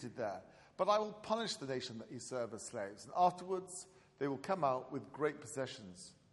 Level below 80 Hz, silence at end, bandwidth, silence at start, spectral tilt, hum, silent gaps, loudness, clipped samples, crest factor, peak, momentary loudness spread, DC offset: -80 dBFS; 0.2 s; 11.5 kHz; 0 s; -4.5 dB/octave; none; none; -39 LUFS; under 0.1%; 20 dB; -20 dBFS; 16 LU; under 0.1%